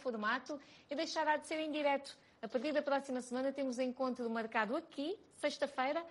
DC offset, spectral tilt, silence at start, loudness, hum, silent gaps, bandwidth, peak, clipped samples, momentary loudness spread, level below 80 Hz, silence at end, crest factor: under 0.1%; -3.5 dB/octave; 0 s; -38 LUFS; none; none; 11.5 kHz; -20 dBFS; under 0.1%; 8 LU; -84 dBFS; 0 s; 18 dB